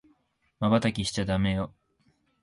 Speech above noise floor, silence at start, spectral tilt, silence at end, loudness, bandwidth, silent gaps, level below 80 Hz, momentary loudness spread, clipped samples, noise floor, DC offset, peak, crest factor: 43 dB; 0.6 s; -5.5 dB/octave; 0.75 s; -28 LUFS; 11.5 kHz; none; -48 dBFS; 7 LU; under 0.1%; -69 dBFS; under 0.1%; -10 dBFS; 18 dB